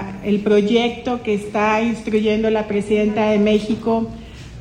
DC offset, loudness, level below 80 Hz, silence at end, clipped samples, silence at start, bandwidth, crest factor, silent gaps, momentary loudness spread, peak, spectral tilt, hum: under 0.1%; -18 LUFS; -44 dBFS; 0 s; under 0.1%; 0 s; 10.5 kHz; 14 dB; none; 6 LU; -4 dBFS; -6.5 dB/octave; none